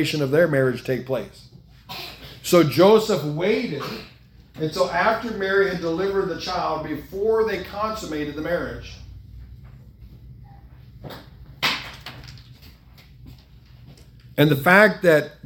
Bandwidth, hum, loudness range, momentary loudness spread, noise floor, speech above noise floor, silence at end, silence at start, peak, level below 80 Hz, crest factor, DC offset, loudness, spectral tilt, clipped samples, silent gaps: 18 kHz; none; 11 LU; 23 LU; -48 dBFS; 27 dB; 0.1 s; 0 s; 0 dBFS; -48 dBFS; 22 dB; under 0.1%; -21 LUFS; -5.5 dB/octave; under 0.1%; none